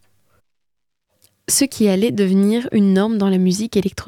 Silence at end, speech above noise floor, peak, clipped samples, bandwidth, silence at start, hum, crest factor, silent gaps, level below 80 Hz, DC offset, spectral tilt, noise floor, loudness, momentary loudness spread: 0.05 s; 64 dB; -4 dBFS; under 0.1%; 17 kHz; 1.5 s; none; 14 dB; none; -52 dBFS; under 0.1%; -5 dB/octave; -80 dBFS; -17 LUFS; 4 LU